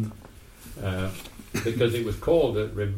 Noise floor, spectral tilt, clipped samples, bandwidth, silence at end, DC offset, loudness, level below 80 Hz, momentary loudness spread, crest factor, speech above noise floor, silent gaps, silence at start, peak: -47 dBFS; -6 dB/octave; under 0.1%; 16.5 kHz; 0 s; under 0.1%; -27 LUFS; -44 dBFS; 21 LU; 18 dB; 22 dB; none; 0 s; -10 dBFS